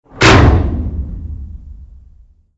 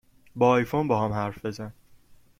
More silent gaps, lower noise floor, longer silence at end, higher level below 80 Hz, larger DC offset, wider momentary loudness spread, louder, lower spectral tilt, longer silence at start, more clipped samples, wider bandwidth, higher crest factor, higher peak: neither; second, -45 dBFS vs -54 dBFS; about the same, 0.75 s vs 0.7 s; first, -20 dBFS vs -56 dBFS; neither; first, 22 LU vs 18 LU; first, -11 LUFS vs -25 LUFS; second, -5.5 dB/octave vs -7.5 dB/octave; second, 0.15 s vs 0.35 s; first, 0.3% vs under 0.1%; second, 9 kHz vs 16 kHz; second, 14 dB vs 20 dB; first, 0 dBFS vs -8 dBFS